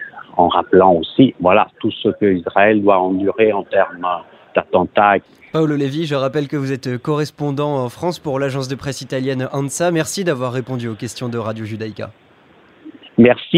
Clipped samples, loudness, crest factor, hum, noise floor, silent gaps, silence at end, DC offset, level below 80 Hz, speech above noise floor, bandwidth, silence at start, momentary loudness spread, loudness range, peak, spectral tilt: under 0.1%; -17 LUFS; 16 dB; none; -49 dBFS; none; 0 s; under 0.1%; -54 dBFS; 32 dB; 15 kHz; 0 s; 12 LU; 7 LU; 0 dBFS; -6 dB/octave